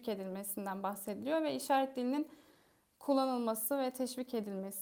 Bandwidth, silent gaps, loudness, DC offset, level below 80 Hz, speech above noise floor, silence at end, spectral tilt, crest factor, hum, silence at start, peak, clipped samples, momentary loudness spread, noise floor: over 20 kHz; none; -37 LUFS; under 0.1%; -82 dBFS; 34 dB; 0 s; -4.5 dB/octave; 16 dB; none; 0 s; -20 dBFS; under 0.1%; 8 LU; -70 dBFS